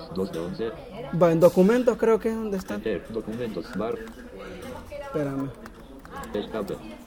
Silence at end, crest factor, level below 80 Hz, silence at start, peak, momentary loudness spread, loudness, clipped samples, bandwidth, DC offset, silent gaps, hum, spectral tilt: 0 s; 20 dB; -50 dBFS; 0 s; -6 dBFS; 21 LU; -26 LUFS; under 0.1%; 19 kHz; under 0.1%; none; none; -7 dB/octave